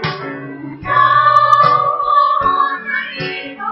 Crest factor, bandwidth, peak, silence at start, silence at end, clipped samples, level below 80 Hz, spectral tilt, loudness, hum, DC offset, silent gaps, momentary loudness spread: 14 dB; 6.8 kHz; 0 dBFS; 0 s; 0 s; under 0.1%; -48 dBFS; -5.5 dB/octave; -13 LUFS; none; under 0.1%; none; 17 LU